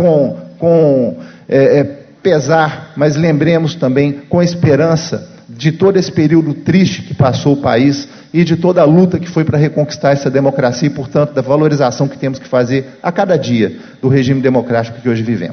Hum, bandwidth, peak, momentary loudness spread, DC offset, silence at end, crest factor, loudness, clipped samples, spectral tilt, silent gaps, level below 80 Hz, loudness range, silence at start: none; 6.6 kHz; 0 dBFS; 7 LU; under 0.1%; 0 s; 12 dB; -13 LUFS; under 0.1%; -7 dB/octave; none; -44 dBFS; 2 LU; 0 s